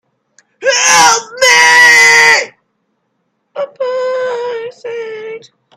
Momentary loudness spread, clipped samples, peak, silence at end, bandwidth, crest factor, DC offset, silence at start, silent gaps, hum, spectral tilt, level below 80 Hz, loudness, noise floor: 21 LU; 0.3%; 0 dBFS; 0.4 s; over 20 kHz; 12 dB; under 0.1%; 0.6 s; none; none; 1 dB/octave; -56 dBFS; -7 LUFS; -65 dBFS